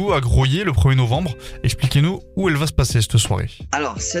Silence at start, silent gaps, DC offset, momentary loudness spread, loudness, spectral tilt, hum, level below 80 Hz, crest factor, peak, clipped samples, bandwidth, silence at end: 0 s; none; under 0.1%; 7 LU; -19 LUFS; -5 dB/octave; none; -28 dBFS; 16 dB; -2 dBFS; under 0.1%; 15 kHz; 0 s